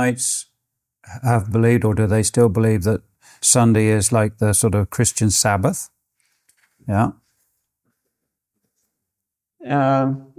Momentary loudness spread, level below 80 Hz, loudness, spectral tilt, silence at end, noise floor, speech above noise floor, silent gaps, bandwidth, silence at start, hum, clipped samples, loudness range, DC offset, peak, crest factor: 8 LU; -42 dBFS; -18 LUFS; -5 dB/octave; 0.15 s; -83 dBFS; 66 dB; none; 16 kHz; 0 s; none; under 0.1%; 13 LU; under 0.1%; -2 dBFS; 18 dB